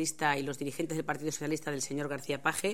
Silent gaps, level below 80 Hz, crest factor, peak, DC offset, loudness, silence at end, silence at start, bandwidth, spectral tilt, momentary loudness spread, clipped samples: none; -70 dBFS; 22 dB; -12 dBFS; 0.4%; -34 LUFS; 0 s; 0 s; 17 kHz; -3.5 dB/octave; 5 LU; under 0.1%